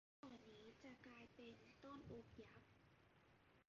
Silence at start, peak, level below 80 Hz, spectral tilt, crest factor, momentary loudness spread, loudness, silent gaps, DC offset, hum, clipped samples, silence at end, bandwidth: 0.25 s; -46 dBFS; -80 dBFS; -4.5 dB/octave; 18 dB; 5 LU; -63 LUFS; none; under 0.1%; none; under 0.1%; 0.05 s; 7.2 kHz